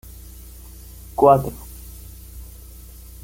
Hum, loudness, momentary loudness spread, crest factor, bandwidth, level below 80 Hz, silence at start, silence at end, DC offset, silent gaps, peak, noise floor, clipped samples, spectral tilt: 60 Hz at -40 dBFS; -18 LUFS; 26 LU; 22 dB; 17 kHz; -40 dBFS; 1.2 s; 0.8 s; under 0.1%; none; -2 dBFS; -40 dBFS; under 0.1%; -7 dB/octave